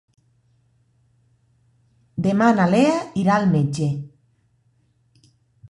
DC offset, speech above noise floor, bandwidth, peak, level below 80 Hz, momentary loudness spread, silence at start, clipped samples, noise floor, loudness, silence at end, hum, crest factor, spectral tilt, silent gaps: under 0.1%; 45 dB; 11 kHz; -4 dBFS; -58 dBFS; 14 LU; 2.15 s; under 0.1%; -63 dBFS; -19 LUFS; 1.65 s; none; 18 dB; -7 dB/octave; none